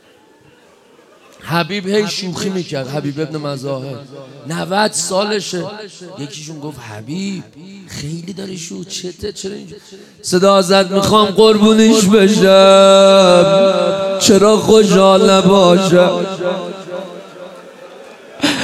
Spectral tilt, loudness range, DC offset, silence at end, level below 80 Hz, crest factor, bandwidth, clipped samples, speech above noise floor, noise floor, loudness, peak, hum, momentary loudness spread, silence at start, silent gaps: -4.5 dB/octave; 17 LU; under 0.1%; 0 s; -52 dBFS; 14 dB; 14.5 kHz; under 0.1%; 35 dB; -47 dBFS; -11 LUFS; 0 dBFS; none; 20 LU; 1.45 s; none